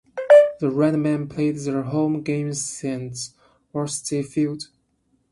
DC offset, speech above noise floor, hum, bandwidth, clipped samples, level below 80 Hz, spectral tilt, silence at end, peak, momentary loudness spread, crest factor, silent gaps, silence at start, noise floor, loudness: under 0.1%; 44 dB; none; 11.5 kHz; under 0.1%; -62 dBFS; -5.5 dB/octave; 0.7 s; -2 dBFS; 18 LU; 20 dB; none; 0.15 s; -67 dBFS; -21 LUFS